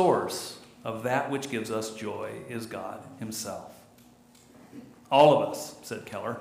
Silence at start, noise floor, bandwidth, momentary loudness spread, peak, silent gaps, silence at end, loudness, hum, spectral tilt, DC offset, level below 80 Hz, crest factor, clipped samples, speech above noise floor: 0 s; -56 dBFS; 15.5 kHz; 21 LU; -6 dBFS; none; 0 s; -28 LUFS; none; -4.5 dB/octave; under 0.1%; -72 dBFS; 24 dB; under 0.1%; 28 dB